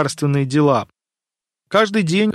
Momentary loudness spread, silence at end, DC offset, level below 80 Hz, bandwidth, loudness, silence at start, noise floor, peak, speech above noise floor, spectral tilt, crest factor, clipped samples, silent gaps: 5 LU; 0 s; under 0.1%; -60 dBFS; 13 kHz; -17 LUFS; 0 s; -89 dBFS; -2 dBFS; 72 dB; -6 dB/octave; 16 dB; under 0.1%; none